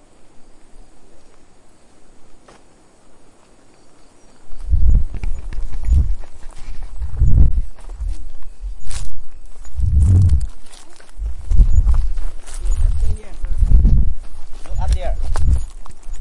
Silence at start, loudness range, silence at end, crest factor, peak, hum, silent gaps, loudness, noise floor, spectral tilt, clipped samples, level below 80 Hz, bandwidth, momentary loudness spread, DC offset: 0.2 s; 6 LU; 0 s; 14 dB; 0 dBFS; none; none; -21 LUFS; -46 dBFS; -7 dB/octave; under 0.1%; -18 dBFS; 11 kHz; 23 LU; under 0.1%